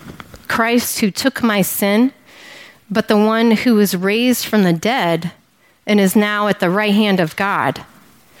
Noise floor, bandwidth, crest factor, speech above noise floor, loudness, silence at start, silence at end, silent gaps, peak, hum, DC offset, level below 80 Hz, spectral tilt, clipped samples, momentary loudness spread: -43 dBFS; 17 kHz; 16 dB; 28 dB; -15 LUFS; 0.05 s; 0.55 s; none; 0 dBFS; none; under 0.1%; -56 dBFS; -5 dB/octave; under 0.1%; 8 LU